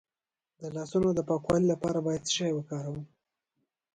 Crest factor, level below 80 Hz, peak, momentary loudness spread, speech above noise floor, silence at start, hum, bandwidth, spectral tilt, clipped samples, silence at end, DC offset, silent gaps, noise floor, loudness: 18 dB; -60 dBFS; -12 dBFS; 13 LU; over 61 dB; 0.6 s; none; 11 kHz; -5.5 dB/octave; under 0.1%; 0.9 s; under 0.1%; none; under -90 dBFS; -30 LUFS